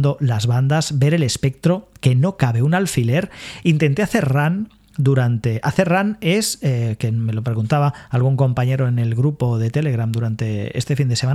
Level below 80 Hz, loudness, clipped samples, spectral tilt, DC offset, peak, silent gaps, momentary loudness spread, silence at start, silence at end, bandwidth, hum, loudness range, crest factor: -48 dBFS; -19 LUFS; under 0.1%; -6 dB/octave; under 0.1%; 0 dBFS; none; 5 LU; 0 s; 0 s; 13.5 kHz; none; 1 LU; 18 dB